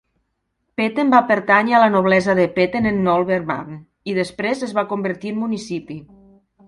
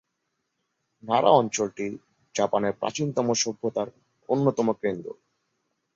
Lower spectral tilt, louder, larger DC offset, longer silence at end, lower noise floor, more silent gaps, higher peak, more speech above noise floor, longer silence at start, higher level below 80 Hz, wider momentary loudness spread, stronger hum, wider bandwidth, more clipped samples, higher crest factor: first, -6.5 dB/octave vs -4.5 dB/octave; first, -18 LUFS vs -25 LUFS; neither; second, 0.65 s vs 0.85 s; second, -72 dBFS vs -78 dBFS; neither; first, 0 dBFS vs -4 dBFS; about the same, 54 dB vs 54 dB; second, 0.8 s vs 1.05 s; first, -54 dBFS vs -68 dBFS; about the same, 15 LU vs 15 LU; neither; first, 11.5 kHz vs 7.8 kHz; neither; about the same, 18 dB vs 22 dB